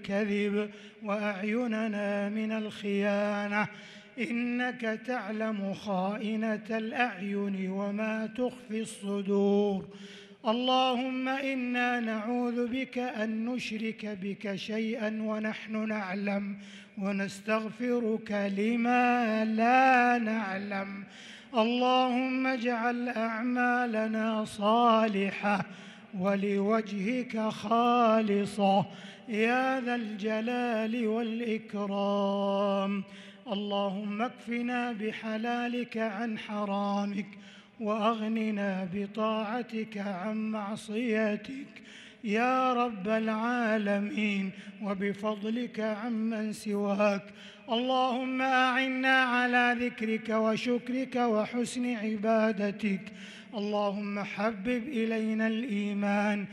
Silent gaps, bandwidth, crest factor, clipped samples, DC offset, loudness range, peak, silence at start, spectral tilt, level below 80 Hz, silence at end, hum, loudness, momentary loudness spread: none; 11.5 kHz; 18 dB; under 0.1%; under 0.1%; 6 LU; -12 dBFS; 0 s; -6 dB/octave; -76 dBFS; 0 s; none; -30 LUFS; 10 LU